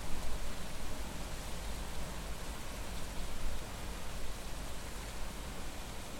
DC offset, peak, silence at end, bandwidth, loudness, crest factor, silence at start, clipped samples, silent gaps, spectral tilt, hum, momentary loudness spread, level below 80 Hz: under 0.1%; -20 dBFS; 0 s; 16.5 kHz; -44 LUFS; 16 dB; 0 s; under 0.1%; none; -3.5 dB/octave; none; 1 LU; -42 dBFS